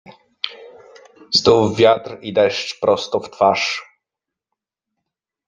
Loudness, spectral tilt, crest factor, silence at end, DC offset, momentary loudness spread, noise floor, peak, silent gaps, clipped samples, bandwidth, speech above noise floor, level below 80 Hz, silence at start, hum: -17 LUFS; -4 dB/octave; 18 dB; 1.65 s; under 0.1%; 15 LU; -85 dBFS; -2 dBFS; none; under 0.1%; 9.4 kHz; 69 dB; -56 dBFS; 0.1 s; none